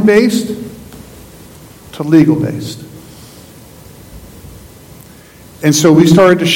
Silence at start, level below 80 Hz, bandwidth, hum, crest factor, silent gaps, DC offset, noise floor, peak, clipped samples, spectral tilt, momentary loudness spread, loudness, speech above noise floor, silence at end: 0 s; -44 dBFS; 17 kHz; none; 14 dB; none; under 0.1%; -38 dBFS; 0 dBFS; 0.9%; -5.5 dB/octave; 27 LU; -10 LUFS; 29 dB; 0 s